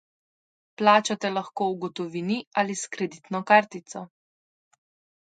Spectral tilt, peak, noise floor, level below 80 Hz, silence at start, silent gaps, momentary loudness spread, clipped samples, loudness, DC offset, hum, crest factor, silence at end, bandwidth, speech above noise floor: -4 dB/octave; -2 dBFS; under -90 dBFS; -76 dBFS; 0.8 s; 2.47-2.51 s; 15 LU; under 0.1%; -25 LUFS; under 0.1%; none; 24 dB; 1.3 s; 9.4 kHz; over 65 dB